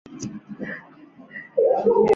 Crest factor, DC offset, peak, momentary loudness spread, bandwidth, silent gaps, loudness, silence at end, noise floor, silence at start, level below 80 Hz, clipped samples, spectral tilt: 16 dB; under 0.1%; -6 dBFS; 20 LU; 7.6 kHz; none; -22 LUFS; 0 s; -47 dBFS; 0.1 s; -62 dBFS; under 0.1%; -6.5 dB/octave